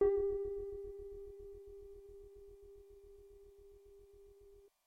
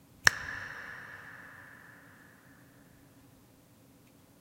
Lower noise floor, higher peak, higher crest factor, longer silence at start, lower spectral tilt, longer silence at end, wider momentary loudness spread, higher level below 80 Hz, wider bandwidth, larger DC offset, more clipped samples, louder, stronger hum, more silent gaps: about the same, -63 dBFS vs -60 dBFS; second, -22 dBFS vs 0 dBFS; second, 22 dB vs 38 dB; second, 0 s vs 0.2 s; first, -8.5 dB/octave vs -0.5 dB/octave; second, 0.2 s vs 1.2 s; second, 23 LU vs 30 LU; first, -60 dBFS vs -66 dBFS; second, 2.9 kHz vs 16 kHz; neither; neither; second, -43 LUFS vs -33 LUFS; neither; neither